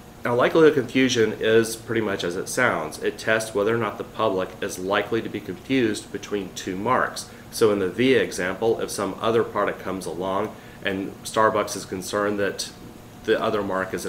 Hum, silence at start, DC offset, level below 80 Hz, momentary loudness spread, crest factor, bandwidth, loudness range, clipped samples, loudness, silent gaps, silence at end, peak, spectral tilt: none; 0 s; under 0.1%; -54 dBFS; 10 LU; 20 dB; 16 kHz; 4 LU; under 0.1%; -23 LUFS; none; 0 s; -4 dBFS; -4.5 dB/octave